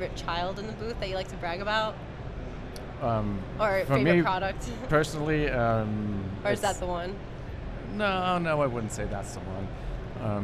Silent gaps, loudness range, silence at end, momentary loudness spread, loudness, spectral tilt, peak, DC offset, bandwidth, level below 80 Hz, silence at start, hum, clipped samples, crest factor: none; 5 LU; 0 s; 14 LU; -29 LUFS; -6 dB/octave; -8 dBFS; under 0.1%; 13.5 kHz; -42 dBFS; 0 s; none; under 0.1%; 20 dB